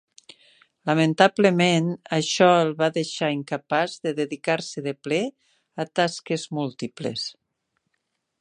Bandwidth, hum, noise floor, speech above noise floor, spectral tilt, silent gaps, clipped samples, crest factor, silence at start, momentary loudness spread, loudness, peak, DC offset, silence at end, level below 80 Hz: 10 kHz; none; -77 dBFS; 54 dB; -5 dB/octave; none; under 0.1%; 22 dB; 0.85 s; 13 LU; -23 LUFS; -2 dBFS; under 0.1%; 1.1 s; -72 dBFS